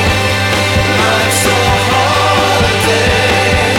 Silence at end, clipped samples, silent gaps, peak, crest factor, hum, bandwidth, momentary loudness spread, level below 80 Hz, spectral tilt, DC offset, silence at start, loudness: 0 s; under 0.1%; none; 0 dBFS; 10 dB; none; 17.5 kHz; 1 LU; -26 dBFS; -3.5 dB/octave; under 0.1%; 0 s; -10 LUFS